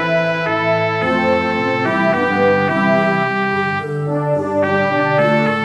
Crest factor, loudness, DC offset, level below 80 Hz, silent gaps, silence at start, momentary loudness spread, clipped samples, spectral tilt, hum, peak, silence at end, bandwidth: 14 dB; -16 LUFS; 0.2%; -54 dBFS; none; 0 s; 4 LU; under 0.1%; -7 dB/octave; none; -2 dBFS; 0 s; 11.5 kHz